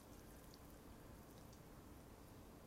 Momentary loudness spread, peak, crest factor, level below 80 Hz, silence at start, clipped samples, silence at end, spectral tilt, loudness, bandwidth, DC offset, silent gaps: 1 LU; -42 dBFS; 18 dB; -66 dBFS; 0 s; under 0.1%; 0 s; -5 dB/octave; -61 LUFS; 16 kHz; under 0.1%; none